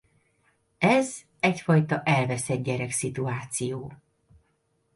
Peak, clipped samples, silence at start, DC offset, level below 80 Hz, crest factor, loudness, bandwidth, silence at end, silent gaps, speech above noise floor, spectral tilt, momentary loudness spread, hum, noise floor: -8 dBFS; under 0.1%; 0.8 s; under 0.1%; -62 dBFS; 20 dB; -26 LUFS; 11.5 kHz; 1 s; none; 46 dB; -5.5 dB/octave; 10 LU; none; -71 dBFS